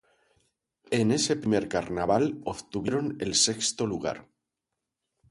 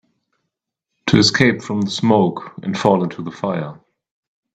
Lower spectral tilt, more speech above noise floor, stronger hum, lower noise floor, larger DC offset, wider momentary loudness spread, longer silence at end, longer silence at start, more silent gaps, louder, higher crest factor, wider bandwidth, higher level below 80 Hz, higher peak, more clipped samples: second, -3.5 dB/octave vs -5 dB/octave; second, 58 dB vs 62 dB; neither; first, -86 dBFS vs -79 dBFS; neither; second, 10 LU vs 13 LU; first, 1.1 s vs 0.8 s; second, 0.9 s vs 1.05 s; neither; second, -27 LUFS vs -17 LUFS; about the same, 20 dB vs 20 dB; first, 11.5 kHz vs 9.2 kHz; second, -58 dBFS vs -52 dBFS; second, -10 dBFS vs 0 dBFS; neither